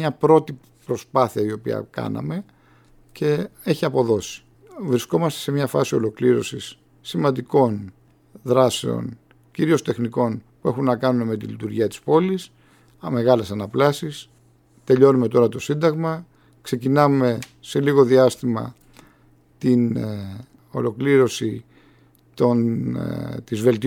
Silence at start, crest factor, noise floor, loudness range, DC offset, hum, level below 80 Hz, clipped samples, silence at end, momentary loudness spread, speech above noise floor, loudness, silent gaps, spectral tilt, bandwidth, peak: 0 s; 20 dB; -55 dBFS; 4 LU; under 0.1%; none; -60 dBFS; under 0.1%; 0 s; 16 LU; 35 dB; -21 LUFS; none; -6.5 dB/octave; 17.5 kHz; -2 dBFS